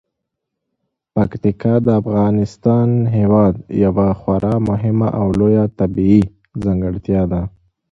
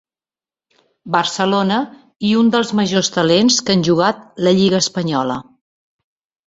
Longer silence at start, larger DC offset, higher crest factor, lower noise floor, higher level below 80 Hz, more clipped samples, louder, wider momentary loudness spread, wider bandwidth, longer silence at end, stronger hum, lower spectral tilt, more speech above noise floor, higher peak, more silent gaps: about the same, 1.15 s vs 1.05 s; neither; about the same, 16 dB vs 16 dB; second, -77 dBFS vs under -90 dBFS; first, -36 dBFS vs -56 dBFS; neither; about the same, -16 LUFS vs -16 LUFS; about the same, 7 LU vs 7 LU; about the same, 7.4 kHz vs 8 kHz; second, 0.45 s vs 1.05 s; neither; first, -10.5 dB/octave vs -4.5 dB/octave; second, 63 dB vs over 75 dB; about the same, 0 dBFS vs -2 dBFS; second, none vs 2.16-2.20 s